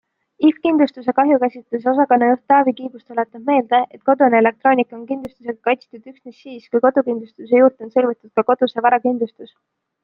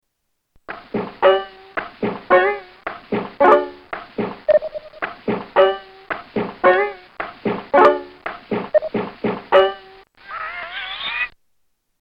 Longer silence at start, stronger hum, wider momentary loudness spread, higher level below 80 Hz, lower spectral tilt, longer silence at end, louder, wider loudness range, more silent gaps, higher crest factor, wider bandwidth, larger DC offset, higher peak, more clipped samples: second, 0.4 s vs 0.7 s; neither; second, 12 LU vs 17 LU; second, -66 dBFS vs -54 dBFS; about the same, -8 dB/octave vs -7 dB/octave; about the same, 0.6 s vs 0.7 s; about the same, -17 LUFS vs -19 LUFS; about the same, 3 LU vs 3 LU; neither; about the same, 16 dB vs 18 dB; about the same, 5.4 kHz vs 5.6 kHz; neither; about the same, -2 dBFS vs -2 dBFS; neither